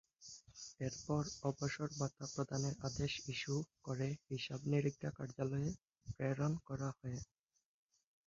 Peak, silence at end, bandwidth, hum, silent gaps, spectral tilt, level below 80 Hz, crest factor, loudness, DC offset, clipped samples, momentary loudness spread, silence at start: -24 dBFS; 1.05 s; 7.6 kHz; none; none; -6 dB/octave; -66 dBFS; 20 dB; -42 LUFS; under 0.1%; under 0.1%; 13 LU; 0.2 s